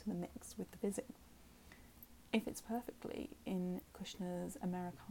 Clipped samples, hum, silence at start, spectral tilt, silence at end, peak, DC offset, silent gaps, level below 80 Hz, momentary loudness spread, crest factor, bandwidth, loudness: under 0.1%; none; 0 s; -5.5 dB/octave; 0 s; -22 dBFS; under 0.1%; none; -66 dBFS; 19 LU; 24 dB; 17.5 kHz; -44 LUFS